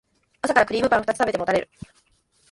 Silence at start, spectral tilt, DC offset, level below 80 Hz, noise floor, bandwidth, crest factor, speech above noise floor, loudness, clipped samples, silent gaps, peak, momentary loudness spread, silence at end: 0.45 s; -4.5 dB/octave; under 0.1%; -54 dBFS; -63 dBFS; 11.5 kHz; 22 dB; 41 dB; -22 LUFS; under 0.1%; none; -2 dBFS; 8 LU; 0.9 s